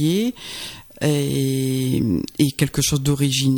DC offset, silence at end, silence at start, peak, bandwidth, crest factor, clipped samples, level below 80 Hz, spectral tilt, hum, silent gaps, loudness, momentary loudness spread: under 0.1%; 0 s; 0 s; -4 dBFS; 19 kHz; 16 dB; under 0.1%; -44 dBFS; -5 dB/octave; none; none; -21 LUFS; 11 LU